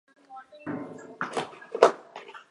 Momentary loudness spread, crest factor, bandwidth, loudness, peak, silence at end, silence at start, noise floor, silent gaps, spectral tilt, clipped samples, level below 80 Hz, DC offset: 24 LU; 28 dB; 11.5 kHz; -28 LUFS; -2 dBFS; 0.1 s; 0.3 s; -48 dBFS; none; -4 dB/octave; under 0.1%; -78 dBFS; under 0.1%